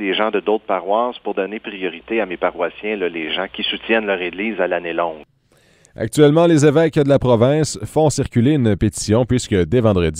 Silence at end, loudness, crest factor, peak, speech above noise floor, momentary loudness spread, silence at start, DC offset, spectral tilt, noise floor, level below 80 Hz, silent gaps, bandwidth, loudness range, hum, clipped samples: 0 s; -18 LUFS; 18 dB; 0 dBFS; 38 dB; 10 LU; 0 s; under 0.1%; -5.5 dB/octave; -55 dBFS; -40 dBFS; none; 15.5 kHz; 6 LU; none; under 0.1%